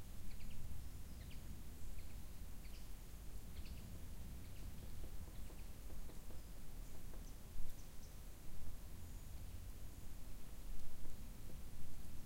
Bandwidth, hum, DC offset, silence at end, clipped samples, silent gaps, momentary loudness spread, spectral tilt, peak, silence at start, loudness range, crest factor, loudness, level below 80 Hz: 16 kHz; none; under 0.1%; 0 s; under 0.1%; none; 3 LU; -5 dB/octave; -28 dBFS; 0 s; 1 LU; 16 dB; -56 LUFS; -52 dBFS